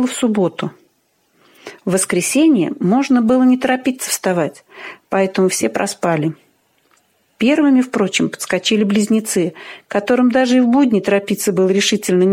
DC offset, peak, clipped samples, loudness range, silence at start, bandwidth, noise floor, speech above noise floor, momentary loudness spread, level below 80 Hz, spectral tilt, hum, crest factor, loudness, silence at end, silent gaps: under 0.1%; -2 dBFS; under 0.1%; 3 LU; 0 s; 16.5 kHz; -61 dBFS; 46 dB; 9 LU; -60 dBFS; -4.5 dB/octave; none; 14 dB; -16 LUFS; 0 s; none